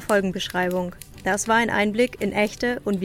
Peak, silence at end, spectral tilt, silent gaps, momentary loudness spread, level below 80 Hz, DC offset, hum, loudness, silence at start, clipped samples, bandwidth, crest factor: -6 dBFS; 0 s; -4 dB/octave; none; 7 LU; -48 dBFS; under 0.1%; none; -23 LUFS; 0 s; under 0.1%; 17 kHz; 16 dB